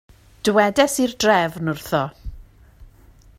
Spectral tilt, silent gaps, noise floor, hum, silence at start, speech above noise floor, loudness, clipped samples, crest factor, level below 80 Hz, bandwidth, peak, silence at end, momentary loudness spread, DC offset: -4 dB/octave; none; -49 dBFS; none; 0.45 s; 30 dB; -19 LUFS; under 0.1%; 20 dB; -44 dBFS; 16 kHz; -2 dBFS; 0.55 s; 13 LU; under 0.1%